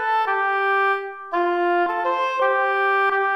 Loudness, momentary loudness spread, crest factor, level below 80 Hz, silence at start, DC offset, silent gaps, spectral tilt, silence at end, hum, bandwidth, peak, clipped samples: -20 LUFS; 4 LU; 12 dB; -72 dBFS; 0 s; under 0.1%; none; -3 dB/octave; 0 s; none; 12.5 kHz; -8 dBFS; under 0.1%